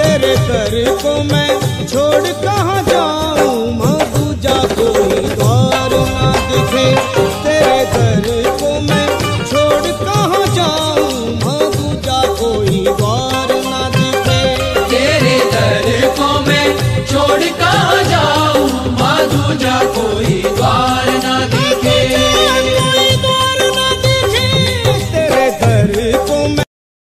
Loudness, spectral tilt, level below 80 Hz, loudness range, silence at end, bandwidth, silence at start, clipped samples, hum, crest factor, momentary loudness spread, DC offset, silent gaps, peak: -12 LUFS; -4.5 dB/octave; -30 dBFS; 3 LU; 0.4 s; 15.5 kHz; 0 s; under 0.1%; none; 12 dB; 4 LU; under 0.1%; none; 0 dBFS